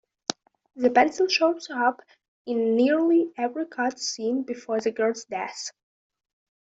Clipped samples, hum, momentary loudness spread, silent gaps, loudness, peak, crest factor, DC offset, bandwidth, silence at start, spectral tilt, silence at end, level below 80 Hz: under 0.1%; none; 13 LU; 2.28-2.45 s; -25 LUFS; -2 dBFS; 24 dB; under 0.1%; 8 kHz; 0.3 s; -3 dB/octave; 1.1 s; -72 dBFS